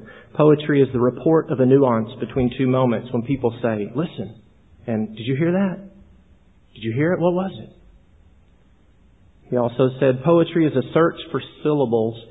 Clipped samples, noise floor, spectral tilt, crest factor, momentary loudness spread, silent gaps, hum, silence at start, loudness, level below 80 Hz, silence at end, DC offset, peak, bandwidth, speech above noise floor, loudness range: under 0.1%; -55 dBFS; -11 dB/octave; 18 dB; 12 LU; none; none; 0 s; -20 LUFS; -50 dBFS; 0.05 s; 0.1%; -2 dBFS; 4 kHz; 36 dB; 8 LU